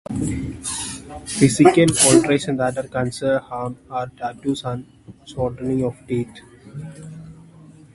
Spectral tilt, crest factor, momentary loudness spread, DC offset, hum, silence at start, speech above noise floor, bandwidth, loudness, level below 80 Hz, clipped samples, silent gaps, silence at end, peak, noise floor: -4.5 dB/octave; 20 dB; 23 LU; under 0.1%; none; 0.1 s; 25 dB; 12 kHz; -20 LUFS; -46 dBFS; under 0.1%; none; 0.25 s; 0 dBFS; -45 dBFS